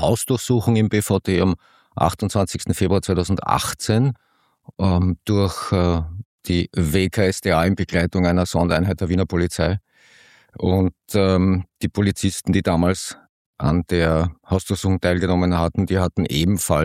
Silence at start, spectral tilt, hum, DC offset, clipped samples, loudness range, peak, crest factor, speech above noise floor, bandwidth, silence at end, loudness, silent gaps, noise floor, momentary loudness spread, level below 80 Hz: 0 s; -6 dB/octave; none; under 0.1%; under 0.1%; 2 LU; -2 dBFS; 18 dB; 33 dB; 16 kHz; 0 s; -20 LUFS; 6.25-6.38 s, 13.29-13.53 s; -52 dBFS; 5 LU; -38 dBFS